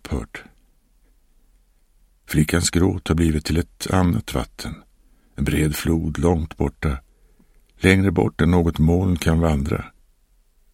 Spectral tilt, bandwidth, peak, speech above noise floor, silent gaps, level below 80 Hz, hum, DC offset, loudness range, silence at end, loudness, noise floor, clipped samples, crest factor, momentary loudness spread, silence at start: -6 dB/octave; 16.5 kHz; 0 dBFS; 39 dB; none; -32 dBFS; none; under 0.1%; 4 LU; 0.85 s; -21 LUFS; -59 dBFS; under 0.1%; 22 dB; 13 LU; 0.05 s